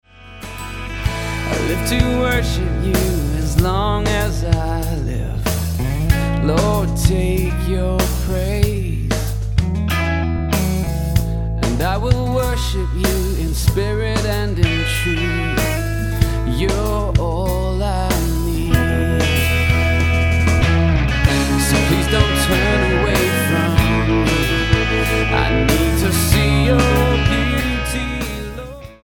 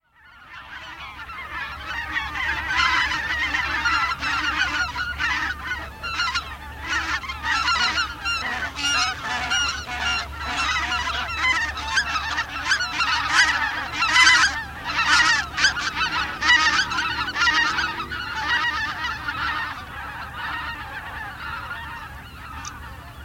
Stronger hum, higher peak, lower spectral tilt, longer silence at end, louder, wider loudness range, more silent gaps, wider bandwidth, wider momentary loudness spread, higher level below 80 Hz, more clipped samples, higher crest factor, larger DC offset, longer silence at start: neither; about the same, 0 dBFS vs 0 dBFS; first, -5.5 dB/octave vs -1 dB/octave; about the same, 0.1 s vs 0 s; first, -18 LUFS vs -21 LUFS; second, 4 LU vs 8 LU; neither; about the same, 17.5 kHz vs 17 kHz; second, 6 LU vs 16 LU; first, -22 dBFS vs -42 dBFS; neither; second, 16 dB vs 24 dB; neither; about the same, 0.2 s vs 0.25 s